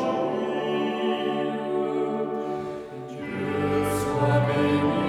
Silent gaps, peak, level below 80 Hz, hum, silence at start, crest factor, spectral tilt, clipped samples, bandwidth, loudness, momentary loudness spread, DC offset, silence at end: none; -10 dBFS; -54 dBFS; none; 0 s; 14 dB; -6.5 dB/octave; under 0.1%; 15.5 kHz; -26 LUFS; 10 LU; under 0.1%; 0 s